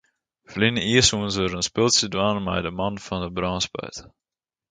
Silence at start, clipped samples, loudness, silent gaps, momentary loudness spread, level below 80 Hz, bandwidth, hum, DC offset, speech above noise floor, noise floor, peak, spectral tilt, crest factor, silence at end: 0.5 s; under 0.1%; -22 LUFS; none; 13 LU; -46 dBFS; 9.6 kHz; none; under 0.1%; 30 dB; -54 dBFS; -4 dBFS; -3.5 dB/octave; 20 dB; 0.6 s